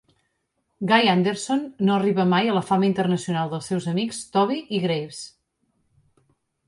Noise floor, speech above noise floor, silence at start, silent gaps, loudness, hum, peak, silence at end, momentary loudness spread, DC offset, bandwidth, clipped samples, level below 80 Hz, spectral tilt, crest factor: -74 dBFS; 52 dB; 0.8 s; none; -22 LUFS; none; -4 dBFS; 1.4 s; 8 LU; under 0.1%; 11.5 kHz; under 0.1%; -66 dBFS; -5.5 dB/octave; 18 dB